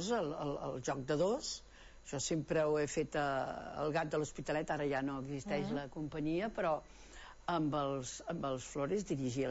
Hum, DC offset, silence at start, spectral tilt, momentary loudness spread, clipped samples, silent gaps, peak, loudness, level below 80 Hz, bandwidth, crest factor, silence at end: none; under 0.1%; 0 s; -5 dB/octave; 8 LU; under 0.1%; none; -22 dBFS; -38 LUFS; -60 dBFS; 8 kHz; 16 dB; 0 s